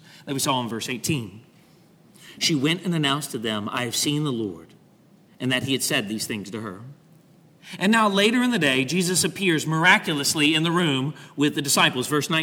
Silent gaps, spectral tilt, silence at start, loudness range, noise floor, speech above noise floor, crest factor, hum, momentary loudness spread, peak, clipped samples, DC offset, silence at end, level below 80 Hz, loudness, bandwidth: none; -3.5 dB/octave; 0.15 s; 7 LU; -55 dBFS; 32 dB; 22 dB; none; 12 LU; -2 dBFS; under 0.1%; under 0.1%; 0 s; -66 dBFS; -22 LUFS; 19 kHz